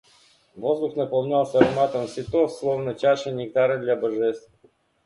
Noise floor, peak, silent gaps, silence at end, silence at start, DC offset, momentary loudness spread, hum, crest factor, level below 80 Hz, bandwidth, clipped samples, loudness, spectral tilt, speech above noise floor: -58 dBFS; 0 dBFS; none; 0.65 s; 0.55 s; under 0.1%; 7 LU; none; 24 dB; -58 dBFS; 11.5 kHz; under 0.1%; -23 LUFS; -6.5 dB/octave; 35 dB